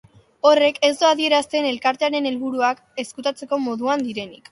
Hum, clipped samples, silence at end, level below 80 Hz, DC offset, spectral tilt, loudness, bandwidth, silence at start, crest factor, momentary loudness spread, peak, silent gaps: none; under 0.1%; 0.15 s; -68 dBFS; under 0.1%; -2.5 dB/octave; -20 LUFS; 11.5 kHz; 0.45 s; 20 dB; 11 LU; -2 dBFS; none